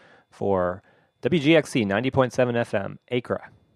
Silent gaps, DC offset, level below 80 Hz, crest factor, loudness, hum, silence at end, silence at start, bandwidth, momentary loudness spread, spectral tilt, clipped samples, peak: none; under 0.1%; -60 dBFS; 20 dB; -24 LUFS; none; 0.3 s; 0.4 s; 12.5 kHz; 12 LU; -6 dB/octave; under 0.1%; -4 dBFS